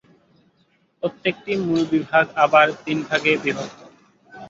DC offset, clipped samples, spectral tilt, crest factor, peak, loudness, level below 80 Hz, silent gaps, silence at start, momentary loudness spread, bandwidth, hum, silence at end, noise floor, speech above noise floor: under 0.1%; under 0.1%; -5.5 dB/octave; 20 dB; -2 dBFS; -20 LUFS; -64 dBFS; none; 1.05 s; 13 LU; 7.8 kHz; none; 0 s; -63 dBFS; 43 dB